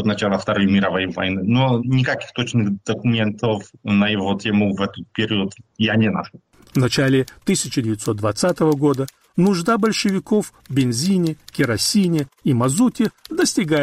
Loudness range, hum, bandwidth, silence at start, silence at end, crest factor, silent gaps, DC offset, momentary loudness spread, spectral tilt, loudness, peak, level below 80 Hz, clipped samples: 2 LU; none; 15.5 kHz; 0 s; 0 s; 12 dB; none; under 0.1%; 6 LU; -5 dB/octave; -19 LUFS; -8 dBFS; -54 dBFS; under 0.1%